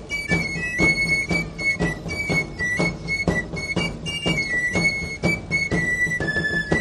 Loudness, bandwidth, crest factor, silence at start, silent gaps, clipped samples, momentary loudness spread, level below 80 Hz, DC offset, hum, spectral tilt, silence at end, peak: -22 LUFS; 14 kHz; 18 dB; 0 s; none; under 0.1%; 5 LU; -40 dBFS; under 0.1%; none; -4.5 dB/octave; 0 s; -6 dBFS